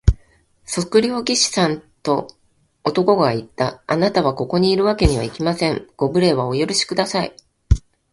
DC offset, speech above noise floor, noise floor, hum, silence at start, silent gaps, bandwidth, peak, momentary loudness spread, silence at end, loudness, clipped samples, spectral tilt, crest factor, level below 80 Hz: under 0.1%; 36 dB; -55 dBFS; none; 0.05 s; none; 11.5 kHz; 0 dBFS; 8 LU; 0.35 s; -19 LUFS; under 0.1%; -5 dB/octave; 18 dB; -30 dBFS